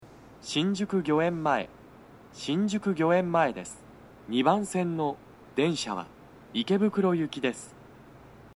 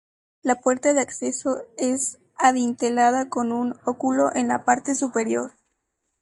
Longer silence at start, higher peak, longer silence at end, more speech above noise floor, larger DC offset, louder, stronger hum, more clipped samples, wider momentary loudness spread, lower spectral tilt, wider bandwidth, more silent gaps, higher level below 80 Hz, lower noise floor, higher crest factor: second, 0 s vs 0.45 s; second, -8 dBFS vs -4 dBFS; second, 0.05 s vs 0.75 s; second, 24 dB vs 54 dB; neither; second, -28 LUFS vs -23 LUFS; neither; neither; first, 18 LU vs 7 LU; first, -5.5 dB/octave vs -3 dB/octave; about the same, 12 kHz vs 11.5 kHz; neither; first, -64 dBFS vs -70 dBFS; second, -51 dBFS vs -76 dBFS; about the same, 20 dB vs 20 dB